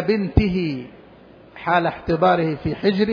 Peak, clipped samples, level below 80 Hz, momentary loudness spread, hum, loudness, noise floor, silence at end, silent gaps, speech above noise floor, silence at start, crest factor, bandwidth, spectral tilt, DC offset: -2 dBFS; under 0.1%; -34 dBFS; 11 LU; none; -20 LUFS; -46 dBFS; 0 s; none; 27 dB; 0 s; 18 dB; 5.4 kHz; -9 dB/octave; under 0.1%